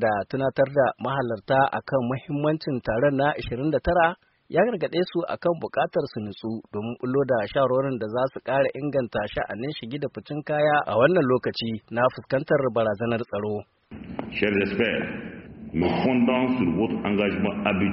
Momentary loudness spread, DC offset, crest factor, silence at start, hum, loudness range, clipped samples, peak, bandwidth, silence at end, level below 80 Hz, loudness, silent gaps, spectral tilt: 10 LU; under 0.1%; 20 dB; 0 s; none; 3 LU; under 0.1%; -6 dBFS; 5.8 kHz; 0 s; -52 dBFS; -25 LUFS; none; -5 dB/octave